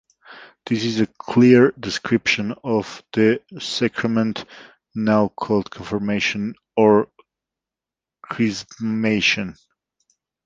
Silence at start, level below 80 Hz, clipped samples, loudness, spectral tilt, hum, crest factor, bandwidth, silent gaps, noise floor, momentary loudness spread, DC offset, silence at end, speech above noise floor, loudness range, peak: 0.3 s; -56 dBFS; under 0.1%; -20 LUFS; -5.5 dB/octave; none; 20 dB; 7.8 kHz; none; -89 dBFS; 12 LU; under 0.1%; 0.95 s; 69 dB; 4 LU; -2 dBFS